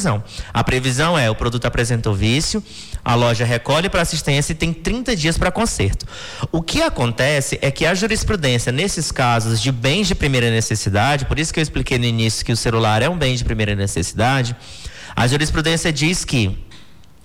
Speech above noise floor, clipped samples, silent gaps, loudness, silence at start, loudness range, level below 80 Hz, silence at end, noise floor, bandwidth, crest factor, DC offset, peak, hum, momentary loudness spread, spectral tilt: 27 dB; under 0.1%; none; -18 LUFS; 0 s; 2 LU; -30 dBFS; 0.2 s; -45 dBFS; 16 kHz; 10 dB; under 0.1%; -8 dBFS; none; 6 LU; -4.5 dB/octave